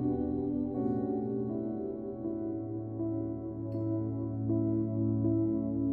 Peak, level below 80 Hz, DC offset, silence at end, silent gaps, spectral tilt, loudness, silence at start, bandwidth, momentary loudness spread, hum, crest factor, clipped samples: -18 dBFS; -56 dBFS; under 0.1%; 0 s; none; -13.5 dB/octave; -33 LUFS; 0 s; 2.1 kHz; 7 LU; none; 14 dB; under 0.1%